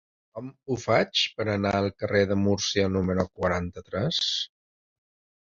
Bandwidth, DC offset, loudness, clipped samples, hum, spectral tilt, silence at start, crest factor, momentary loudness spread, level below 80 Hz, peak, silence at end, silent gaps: 7.6 kHz; under 0.1%; -26 LUFS; under 0.1%; none; -4.5 dB/octave; 0.35 s; 20 dB; 12 LU; -48 dBFS; -6 dBFS; 0.95 s; none